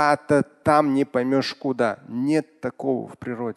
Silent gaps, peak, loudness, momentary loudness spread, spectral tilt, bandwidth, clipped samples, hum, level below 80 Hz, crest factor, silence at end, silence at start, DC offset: none; -4 dBFS; -23 LUFS; 10 LU; -6 dB/octave; 12 kHz; under 0.1%; none; -58 dBFS; 18 dB; 0.05 s; 0 s; under 0.1%